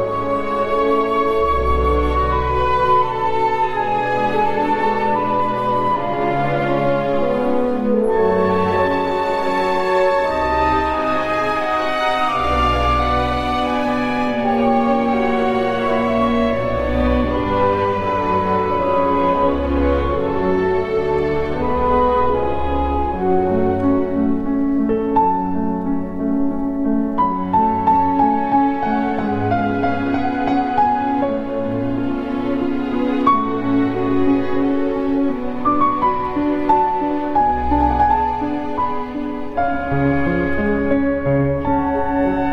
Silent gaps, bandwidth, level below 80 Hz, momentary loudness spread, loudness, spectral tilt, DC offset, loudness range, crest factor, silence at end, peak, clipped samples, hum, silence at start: none; 11 kHz; -32 dBFS; 4 LU; -18 LUFS; -7.5 dB/octave; under 0.1%; 2 LU; 16 dB; 0 s; 0 dBFS; under 0.1%; none; 0 s